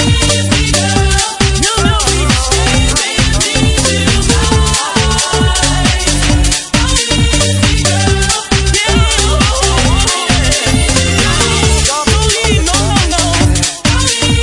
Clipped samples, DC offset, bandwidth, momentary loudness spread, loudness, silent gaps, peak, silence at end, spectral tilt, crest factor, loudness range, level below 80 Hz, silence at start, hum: under 0.1%; under 0.1%; 11.5 kHz; 1 LU; -10 LUFS; none; 0 dBFS; 0 s; -3.5 dB/octave; 10 dB; 1 LU; -16 dBFS; 0 s; none